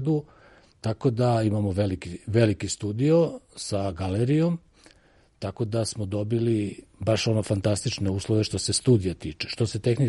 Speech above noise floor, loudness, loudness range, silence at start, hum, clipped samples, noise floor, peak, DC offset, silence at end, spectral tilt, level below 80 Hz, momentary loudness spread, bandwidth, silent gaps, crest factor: 34 dB; -26 LUFS; 3 LU; 0 s; none; under 0.1%; -59 dBFS; -8 dBFS; under 0.1%; 0 s; -6 dB/octave; -52 dBFS; 10 LU; 11.5 kHz; none; 18 dB